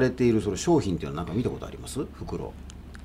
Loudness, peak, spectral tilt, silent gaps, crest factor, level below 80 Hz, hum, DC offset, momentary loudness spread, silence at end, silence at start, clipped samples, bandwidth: -28 LUFS; -12 dBFS; -6 dB/octave; none; 16 dB; -44 dBFS; none; under 0.1%; 14 LU; 0 s; 0 s; under 0.1%; 15.5 kHz